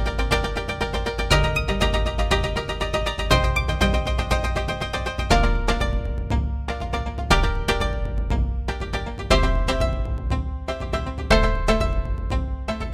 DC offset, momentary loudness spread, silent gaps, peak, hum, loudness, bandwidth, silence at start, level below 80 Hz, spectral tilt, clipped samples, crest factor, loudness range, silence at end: 0.3%; 8 LU; none; 0 dBFS; none; -23 LUFS; 14 kHz; 0 s; -24 dBFS; -5 dB/octave; under 0.1%; 22 dB; 2 LU; 0 s